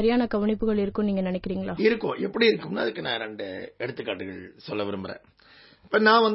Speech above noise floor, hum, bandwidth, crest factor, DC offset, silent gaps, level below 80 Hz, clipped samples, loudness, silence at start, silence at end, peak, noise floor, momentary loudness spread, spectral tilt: 29 dB; none; 5.8 kHz; 22 dB; under 0.1%; none; -52 dBFS; under 0.1%; -26 LUFS; 0 s; 0 s; -4 dBFS; -54 dBFS; 13 LU; -9.5 dB/octave